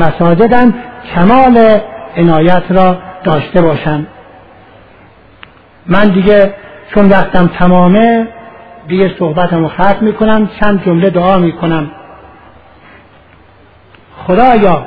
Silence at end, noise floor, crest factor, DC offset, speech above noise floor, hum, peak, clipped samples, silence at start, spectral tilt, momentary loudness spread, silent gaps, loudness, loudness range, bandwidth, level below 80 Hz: 0 s; -41 dBFS; 10 dB; under 0.1%; 34 dB; none; 0 dBFS; 0.6%; 0 s; -10.5 dB/octave; 10 LU; none; -9 LUFS; 6 LU; 5 kHz; -30 dBFS